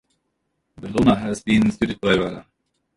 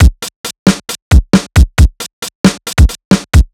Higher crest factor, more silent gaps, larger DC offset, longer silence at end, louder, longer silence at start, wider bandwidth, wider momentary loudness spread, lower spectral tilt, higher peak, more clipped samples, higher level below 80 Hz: first, 20 dB vs 10 dB; second, none vs 0.36-0.44 s, 0.59-0.66 s, 1.02-1.11 s, 2.13-2.22 s, 2.35-2.44 s, 3.05-3.11 s; neither; first, 0.55 s vs 0.1 s; second, -20 LUFS vs -11 LUFS; first, 0.8 s vs 0 s; second, 11.5 kHz vs 16 kHz; about the same, 13 LU vs 12 LU; about the same, -6 dB/octave vs -5.5 dB/octave; about the same, -2 dBFS vs 0 dBFS; second, under 0.1% vs 6%; second, -44 dBFS vs -12 dBFS